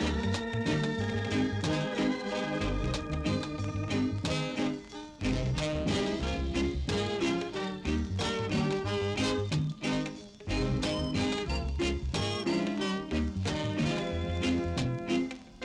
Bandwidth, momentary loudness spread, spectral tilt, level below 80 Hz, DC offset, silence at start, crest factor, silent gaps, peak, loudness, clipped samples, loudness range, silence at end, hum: 11.5 kHz; 3 LU; -5.5 dB/octave; -42 dBFS; under 0.1%; 0 s; 14 dB; none; -16 dBFS; -32 LUFS; under 0.1%; 1 LU; 0 s; none